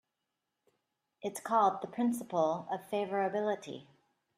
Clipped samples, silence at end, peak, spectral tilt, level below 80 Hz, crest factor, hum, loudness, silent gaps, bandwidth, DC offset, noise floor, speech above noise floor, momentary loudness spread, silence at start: under 0.1%; 0.55 s; -16 dBFS; -5.5 dB/octave; -82 dBFS; 20 dB; none; -33 LUFS; none; 15.5 kHz; under 0.1%; -86 dBFS; 54 dB; 13 LU; 1.25 s